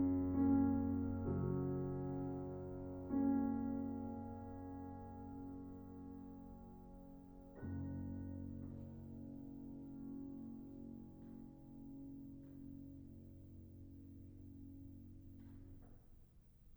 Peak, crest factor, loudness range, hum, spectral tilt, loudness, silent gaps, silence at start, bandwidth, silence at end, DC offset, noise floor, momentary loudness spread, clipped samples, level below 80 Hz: -26 dBFS; 18 dB; 16 LU; none; -11.5 dB/octave; -44 LUFS; none; 0 s; over 20 kHz; 0 s; under 0.1%; -65 dBFS; 21 LU; under 0.1%; -62 dBFS